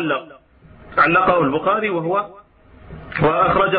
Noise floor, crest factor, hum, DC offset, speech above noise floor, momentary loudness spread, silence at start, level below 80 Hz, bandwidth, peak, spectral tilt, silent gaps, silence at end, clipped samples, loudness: -46 dBFS; 16 dB; none; under 0.1%; 28 dB; 13 LU; 0 s; -46 dBFS; 5 kHz; -2 dBFS; -11 dB/octave; none; 0 s; under 0.1%; -18 LUFS